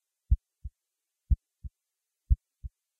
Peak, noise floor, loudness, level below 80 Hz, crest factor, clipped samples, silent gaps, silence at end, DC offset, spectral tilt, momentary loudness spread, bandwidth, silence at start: -12 dBFS; -87 dBFS; -33 LUFS; -34 dBFS; 20 dB; under 0.1%; none; 0.35 s; under 0.1%; -11.5 dB/octave; 18 LU; 0.4 kHz; 0.3 s